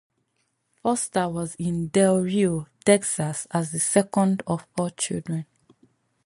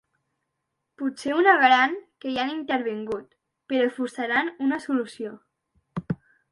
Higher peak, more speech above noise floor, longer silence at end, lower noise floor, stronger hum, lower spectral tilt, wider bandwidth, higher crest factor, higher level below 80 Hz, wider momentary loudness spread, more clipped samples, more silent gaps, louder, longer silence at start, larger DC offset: about the same, -4 dBFS vs -4 dBFS; second, 50 dB vs 56 dB; first, 0.85 s vs 0.35 s; second, -73 dBFS vs -80 dBFS; neither; about the same, -5 dB/octave vs -5 dB/octave; about the same, 11.5 kHz vs 11.5 kHz; about the same, 20 dB vs 20 dB; about the same, -60 dBFS vs -64 dBFS; second, 9 LU vs 17 LU; neither; neither; about the same, -24 LUFS vs -24 LUFS; second, 0.85 s vs 1 s; neither